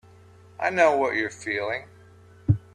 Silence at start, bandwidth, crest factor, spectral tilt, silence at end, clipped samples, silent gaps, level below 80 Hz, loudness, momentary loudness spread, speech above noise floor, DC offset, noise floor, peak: 0.6 s; 10 kHz; 20 dB; -6 dB/octave; 0.15 s; under 0.1%; none; -54 dBFS; -25 LUFS; 12 LU; 27 dB; under 0.1%; -51 dBFS; -6 dBFS